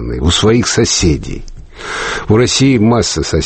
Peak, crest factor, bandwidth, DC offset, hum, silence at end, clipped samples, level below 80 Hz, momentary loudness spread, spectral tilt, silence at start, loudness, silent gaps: 0 dBFS; 12 dB; 8.8 kHz; under 0.1%; none; 0 s; under 0.1%; -26 dBFS; 14 LU; -4.5 dB/octave; 0 s; -12 LUFS; none